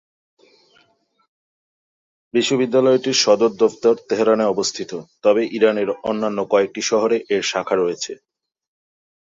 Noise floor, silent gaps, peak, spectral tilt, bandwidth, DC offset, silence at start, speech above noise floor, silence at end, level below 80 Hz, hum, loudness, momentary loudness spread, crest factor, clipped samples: -61 dBFS; none; -2 dBFS; -3.5 dB/octave; 8 kHz; under 0.1%; 2.35 s; 43 dB; 1.15 s; -64 dBFS; none; -18 LUFS; 8 LU; 18 dB; under 0.1%